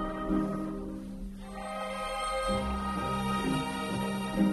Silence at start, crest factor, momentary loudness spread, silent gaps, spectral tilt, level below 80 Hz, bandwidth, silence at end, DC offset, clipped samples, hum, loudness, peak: 0 s; 16 dB; 10 LU; none; -5.5 dB/octave; -44 dBFS; 13 kHz; 0 s; under 0.1%; under 0.1%; none; -33 LUFS; -16 dBFS